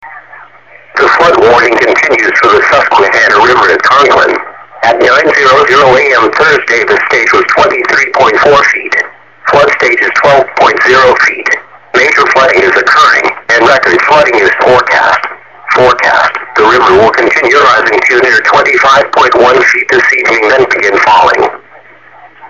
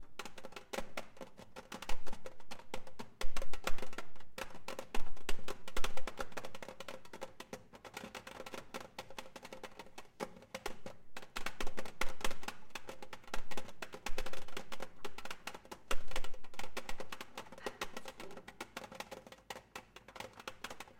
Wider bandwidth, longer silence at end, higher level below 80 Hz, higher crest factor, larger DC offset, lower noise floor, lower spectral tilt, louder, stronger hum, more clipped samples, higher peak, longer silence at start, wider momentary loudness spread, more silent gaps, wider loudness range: second, 8.8 kHz vs 16 kHz; about the same, 0.05 s vs 0.15 s; first, -42 dBFS vs -48 dBFS; second, 6 dB vs 16 dB; first, 0.6% vs under 0.1%; second, -36 dBFS vs -55 dBFS; about the same, -3.5 dB/octave vs -3 dB/octave; first, -5 LUFS vs -47 LUFS; neither; first, 0.5% vs under 0.1%; first, 0 dBFS vs -18 dBFS; about the same, 0.05 s vs 0 s; second, 6 LU vs 9 LU; neither; about the same, 2 LU vs 3 LU